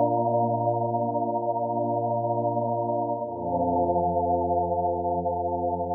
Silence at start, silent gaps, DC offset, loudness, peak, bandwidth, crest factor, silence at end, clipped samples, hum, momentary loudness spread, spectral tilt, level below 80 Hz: 0 s; none; under 0.1%; -26 LUFS; -12 dBFS; 1 kHz; 14 dB; 0 s; under 0.1%; none; 4 LU; -14 dB/octave; -52 dBFS